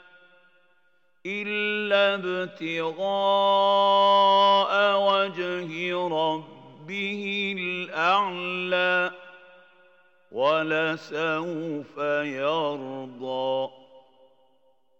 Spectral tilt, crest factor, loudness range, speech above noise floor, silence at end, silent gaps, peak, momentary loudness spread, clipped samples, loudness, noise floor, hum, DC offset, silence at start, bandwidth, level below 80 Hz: -5 dB/octave; 18 dB; 8 LU; 44 dB; 1 s; none; -8 dBFS; 13 LU; under 0.1%; -24 LUFS; -69 dBFS; none; under 0.1%; 1.25 s; 7.6 kHz; -90 dBFS